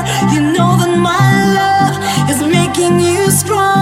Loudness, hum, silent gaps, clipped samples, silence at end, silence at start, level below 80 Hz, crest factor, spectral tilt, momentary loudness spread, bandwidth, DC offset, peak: -11 LUFS; none; none; under 0.1%; 0 s; 0 s; -40 dBFS; 10 dB; -5 dB/octave; 3 LU; 16.5 kHz; under 0.1%; 0 dBFS